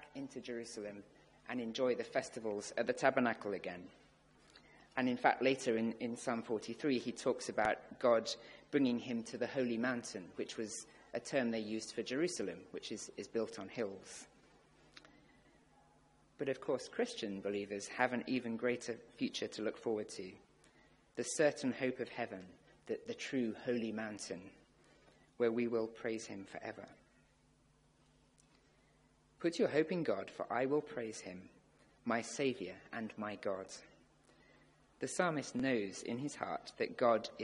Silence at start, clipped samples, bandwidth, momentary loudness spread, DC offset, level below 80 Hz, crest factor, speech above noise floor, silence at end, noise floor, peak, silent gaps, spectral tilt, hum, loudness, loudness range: 0 s; under 0.1%; 11.5 kHz; 13 LU; under 0.1%; -76 dBFS; 26 dB; 32 dB; 0 s; -71 dBFS; -14 dBFS; none; -4.5 dB/octave; none; -39 LUFS; 7 LU